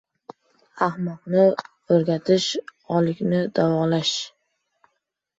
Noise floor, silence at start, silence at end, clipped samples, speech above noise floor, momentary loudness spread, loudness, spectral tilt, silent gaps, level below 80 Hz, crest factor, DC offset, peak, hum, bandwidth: -76 dBFS; 0.75 s; 1.1 s; under 0.1%; 55 dB; 10 LU; -22 LUFS; -5.5 dB/octave; none; -64 dBFS; 18 dB; under 0.1%; -6 dBFS; none; 8 kHz